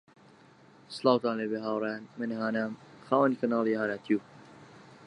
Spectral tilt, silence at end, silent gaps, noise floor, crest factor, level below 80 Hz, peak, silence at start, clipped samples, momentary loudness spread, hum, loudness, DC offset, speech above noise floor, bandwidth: -6.5 dB/octave; 0 s; none; -57 dBFS; 22 dB; -78 dBFS; -10 dBFS; 0.9 s; under 0.1%; 10 LU; none; -30 LUFS; under 0.1%; 28 dB; 10.5 kHz